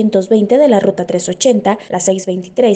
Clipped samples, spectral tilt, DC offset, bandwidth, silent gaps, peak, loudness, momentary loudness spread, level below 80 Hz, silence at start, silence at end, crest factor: under 0.1%; -5 dB/octave; under 0.1%; 9.4 kHz; none; 0 dBFS; -12 LUFS; 8 LU; -56 dBFS; 0 s; 0 s; 12 dB